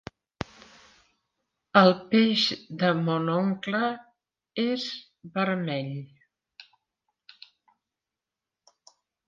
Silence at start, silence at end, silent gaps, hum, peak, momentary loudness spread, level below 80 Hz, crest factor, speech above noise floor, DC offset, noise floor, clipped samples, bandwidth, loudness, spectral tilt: 1.75 s; 2.65 s; none; none; -4 dBFS; 20 LU; -66 dBFS; 24 dB; 64 dB; under 0.1%; -89 dBFS; under 0.1%; 7.4 kHz; -25 LUFS; -6 dB/octave